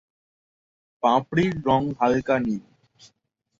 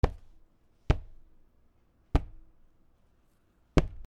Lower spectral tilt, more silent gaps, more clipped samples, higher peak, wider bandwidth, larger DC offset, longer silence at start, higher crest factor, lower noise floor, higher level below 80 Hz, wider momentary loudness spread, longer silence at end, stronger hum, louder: about the same, -7 dB/octave vs -7.5 dB/octave; neither; neither; about the same, -6 dBFS vs -4 dBFS; second, 7.6 kHz vs 9 kHz; neither; first, 1.05 s vs 0.05 s; second, 20 dB vs 30 dB; first, -74 dBFS vs -67 dBFS; second, -54 dBFS vs -36 dBFS; second, 5 LU vs 23 LU; first, 1 s vs 0.05 s; neither; first, -23 LUFS vs -33 LUFS